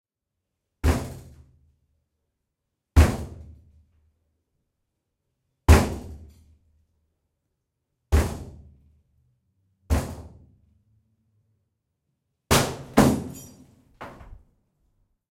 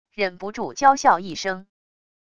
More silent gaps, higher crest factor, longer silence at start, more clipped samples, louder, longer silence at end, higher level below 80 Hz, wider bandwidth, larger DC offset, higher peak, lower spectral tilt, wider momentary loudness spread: neither; first, 26 dB vs 20 dB; first, 0.85 s vs 0.2 s; neither; about the same, -23 LUFS vs -21 LUFS; first, 0.95 s vs 0.75 s; first, -34 dBFS vs -60 dBFS; first, 16.5 kHz vs 10 kHz; neither; about the same, -2 dBFS vs -2 dBFS; first, -5.5 dB/octave vs -3 dB/octave; first, 25 LU vs 14 LU